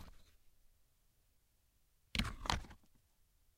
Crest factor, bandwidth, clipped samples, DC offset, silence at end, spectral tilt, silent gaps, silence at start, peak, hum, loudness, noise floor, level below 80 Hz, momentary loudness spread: 32 dB; 16 kHz; under 0.1%; under 0.1%; 0.8 s; -3.5 dB/octave; none; 0 s; -16 dBFS; none; -41 LUFS; -75 dBFS; -54 dBFS; 21 LU